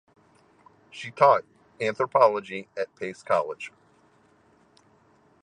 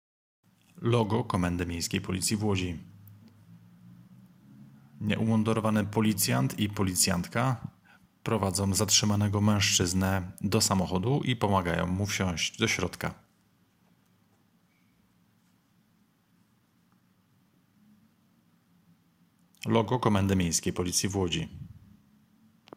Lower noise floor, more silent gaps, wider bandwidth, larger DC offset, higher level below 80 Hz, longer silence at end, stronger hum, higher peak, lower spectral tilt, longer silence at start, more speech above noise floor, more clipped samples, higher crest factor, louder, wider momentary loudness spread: second, -61 dBFS vs -67 dBFS; neither; second, 10 kHz vs 16.5 kHz; neither; second, -76 dBFS vs -60 dBFS; first, 1.75 s vs 1 s; neither; first, -4 dBFS vs -8 dBFS; about the same, -5 dB/octave vs -4 dB/octave; first, 0.95 s vs 0.75 s; about the same, 37 dB vs 40 dB; neither; about the same, 24 dB vs 22 dB; first, -25 LUFS vs -28 LUFS; first, 19 LU vs 10 LU